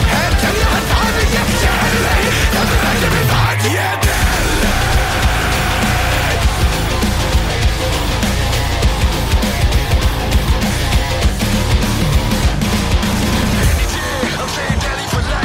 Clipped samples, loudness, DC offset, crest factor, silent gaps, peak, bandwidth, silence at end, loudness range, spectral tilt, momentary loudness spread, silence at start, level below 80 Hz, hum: under 0.1%; -15 LUFS; under 0.1%; 10 dB; none; -4 dBFS; 16.5 kHz; 0 s; 2 LU; -4.5 dB/octave; 3 LU; 0 s; -18 dBFS; none